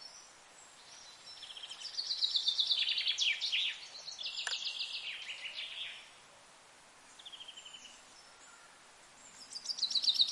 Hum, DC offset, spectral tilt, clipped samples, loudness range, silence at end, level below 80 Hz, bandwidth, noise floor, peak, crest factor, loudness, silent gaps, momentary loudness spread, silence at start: none; under 0.1%; 3 dB/octave; under 0.1%; 18 LU; 0 s; -84 dBFS; 12 kHz; -60 dBFS; -16 dBFS; 24 dB; -34 LUFS; none; 25 LU; 0 s